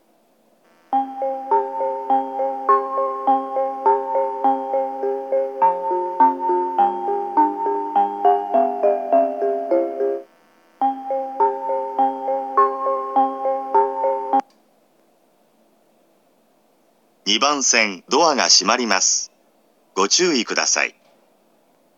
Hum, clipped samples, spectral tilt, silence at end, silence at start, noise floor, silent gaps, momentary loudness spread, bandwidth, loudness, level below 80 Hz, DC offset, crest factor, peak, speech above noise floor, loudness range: none; under 0.1%; -1 dB/octave; 1.1 s; 0.9 s; -59 dBFS; none; 8 LU; 8.2 kHz; -19 LUFS; under -90 dBFS; under 0.1%; 20 dB; 0 dBFS; 42 dB; 6 LU